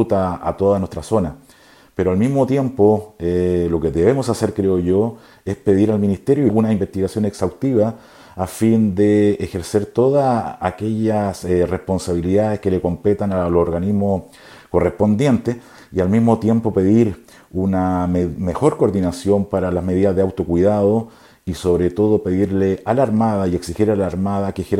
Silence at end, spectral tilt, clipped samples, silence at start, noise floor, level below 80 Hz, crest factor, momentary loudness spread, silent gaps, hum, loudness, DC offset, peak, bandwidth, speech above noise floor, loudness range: 0 s; -8 dB/octave; under 0.1%; 0 s; -48 dBFS; -42 dBFS; 18 dB; 7 LU; none; none; -18 LUFS; under 0.1%; 0 dBFS; 15.5 kHz; 31 dB; 1 LU